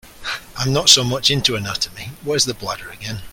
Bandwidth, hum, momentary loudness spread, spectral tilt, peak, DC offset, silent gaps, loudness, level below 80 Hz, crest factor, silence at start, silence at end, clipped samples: 17 kHz; none; 17 LU; -2.5 dB/octave; 0 dBFS; under 0.1%; none; -17 LUFS; -46 dBFS; 20 dB; 0.05 s; 0 s; under 0.1%